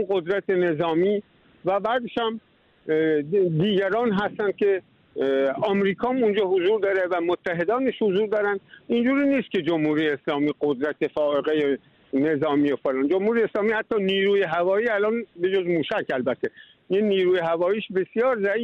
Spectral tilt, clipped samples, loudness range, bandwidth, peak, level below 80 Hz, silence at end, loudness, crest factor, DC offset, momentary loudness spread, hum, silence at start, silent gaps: -8 dB/octave; under 0.1%; 2 LU; 6 kHz; -12 dBFS; -64 dBFS; 0 s; -23 LUFS; 12 dB; under 0.1%; 5 LU; none; 0 s; none